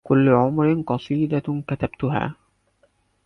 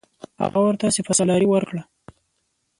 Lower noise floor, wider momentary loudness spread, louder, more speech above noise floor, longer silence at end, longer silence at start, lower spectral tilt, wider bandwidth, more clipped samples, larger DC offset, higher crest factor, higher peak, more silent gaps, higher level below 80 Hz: second, -64 dBFS vs -72 dBFS; about the same, 10 LU vs 11 LU; about the same, -22 LUFS vs -20 LUFS; second, 43 dB vs 52 dB; about the same, 0.95 s vs 0.95 s; second, 0.05 s vs 0.4 s; first, -10 dB/octave vs -5 dB/octave; second, 6 kHz vs 11.5 kHz; neither; neither; about the same, 16 dB vs 16 dB; about the same, -4 dBFS vs -6 dBFS; neither; first, -50 dBFS vs -58 dBFS